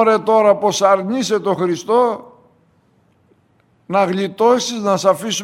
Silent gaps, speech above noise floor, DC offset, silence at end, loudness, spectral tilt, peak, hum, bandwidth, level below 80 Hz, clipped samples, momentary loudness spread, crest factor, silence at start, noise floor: none; 42 dB; under 0.1%; 0 s; -16 LUFS; -4.5 dB/octave; 0 dBFS; none; 16 kHz; -66 dBFS; under 0.1%; 6 LU; 16 dB; 0 s; -57 dBFS